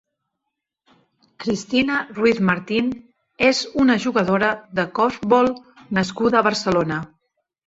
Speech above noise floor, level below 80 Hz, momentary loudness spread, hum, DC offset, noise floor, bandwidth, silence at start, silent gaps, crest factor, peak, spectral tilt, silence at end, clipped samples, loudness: 61 dB; -54 dBFS; 9 LU; none; under 0.1%; -81 dBFS; 8 kHz; 1.4 s; none; 18 dB; -2 dBFS; -5 dB/octave; 0.6 s; under 0.1%; -20 LUFS